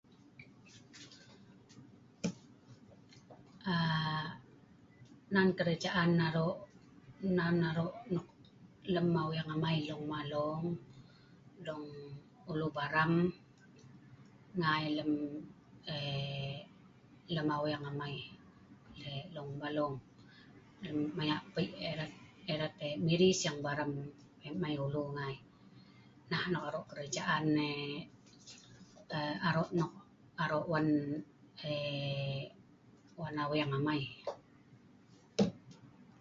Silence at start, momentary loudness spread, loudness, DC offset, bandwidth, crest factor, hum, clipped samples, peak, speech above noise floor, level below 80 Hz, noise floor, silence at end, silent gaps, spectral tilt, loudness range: 0.4 s; 22 LU; -36 LUFS; under 0.1%; 7.6 kHz; 22 dB; none; under 0.1%; -16 dBFS; 27 dB; -68 dBFS; -62 dBFS; 0.15 s; none; -4.5 dB/octave; 6 LU